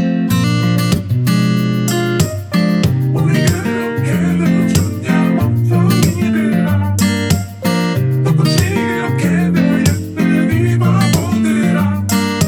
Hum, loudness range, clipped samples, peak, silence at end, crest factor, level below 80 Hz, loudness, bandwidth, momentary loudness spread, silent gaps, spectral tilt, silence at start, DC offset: none; 1 LU; under 0.1%; 0 dBFS; 0 s; 12 dB; -40 dBFS; -14 LUFS; 18 kHz; 4 LU; none; -6 dB/octave; 0 s; under 0.1%